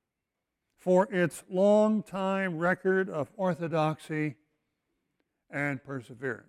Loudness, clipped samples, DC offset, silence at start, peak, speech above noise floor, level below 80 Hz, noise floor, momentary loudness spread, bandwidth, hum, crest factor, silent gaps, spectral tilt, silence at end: -29 LUFS; under 0.1%; under 0.1%; 0.85 s; -12 dBFS; 58 dB; -72 dBFS; -86 dBFS; 12 LU; 14.5 kHz; none; 18 dB; none; -7 dB/octave; 0.1 s